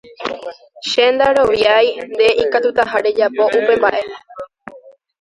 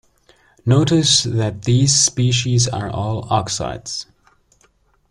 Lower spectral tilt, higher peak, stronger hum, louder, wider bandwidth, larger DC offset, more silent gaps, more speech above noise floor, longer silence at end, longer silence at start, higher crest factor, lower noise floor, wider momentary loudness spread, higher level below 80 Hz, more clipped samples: about the same, -3 dB/octave vs -4 dB/octave; about the same, 0 dBFS vs 0 dBFS; neither; first, -14 LUFS vs -17 LUFS; about the same, 11 kHz vs 11.5 kHz; neither; neither; second, 28 dB vs 41 dB; second, 0.4 s vs 1.1 s; second, 0.2 s vs 0.65 s; about the same, 16 dB vs 18 dB; second, -43 dBFS vs -58 dBFS; first, 19 LU vs 12 LU; second, -52 dBFS vs -46 dBFS; neither